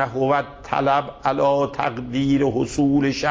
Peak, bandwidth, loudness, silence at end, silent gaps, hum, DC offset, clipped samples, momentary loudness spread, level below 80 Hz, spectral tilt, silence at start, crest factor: -6 dBFS; 7.8 kHz; -21 LUFS; 0 s; none; none; under 0.1%; under 0.1%; 5 LU; -46 dBFS; -6 dB/octave; 0 s; 16 dB